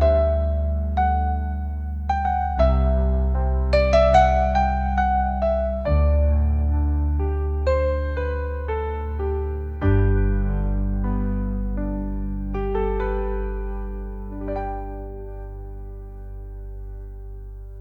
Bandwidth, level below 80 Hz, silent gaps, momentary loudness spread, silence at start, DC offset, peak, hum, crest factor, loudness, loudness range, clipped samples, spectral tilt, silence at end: 6.8 kHz; -24 dBFS; none; 18 LU; 0 s; under 0.1%; -4 dBFS; none; 18 dB; -23 LUFS; 13 LU; under 0.1%; -8.5 dB/octave; 0 s